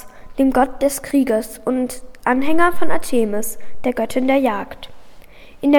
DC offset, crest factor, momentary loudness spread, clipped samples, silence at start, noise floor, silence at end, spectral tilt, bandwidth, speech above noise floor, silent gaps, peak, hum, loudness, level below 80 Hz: under 0.1%; 16 dB; 11 LU; under 0.1%; 0.05 s; -42 dBFS; 0 s; -4.5 dB/octave; 19.5 kHz; 26 dB; none; 0 dBFS; none; -19 LUFS; -40 dBFS